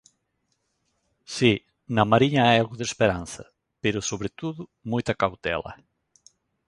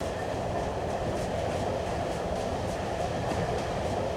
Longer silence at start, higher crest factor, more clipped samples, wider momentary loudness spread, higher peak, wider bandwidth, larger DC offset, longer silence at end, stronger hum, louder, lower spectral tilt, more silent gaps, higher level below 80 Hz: first, 1.3 s vs 0 s; first, 24 dB vs 12 dB; neither; first, 16 LU vs 2 LU; first, -2 dBFS vs -18 dBFS; second, 11.5 kHz vs 17 kHz; neither; first, 0.95 s vs 0 s; neither; first, -24 LUFS vs -31 LUFS; about the same, -5 dB/octave vs -5.5 dB/octave; neither; second, -52 dBFS vs -42 dBFS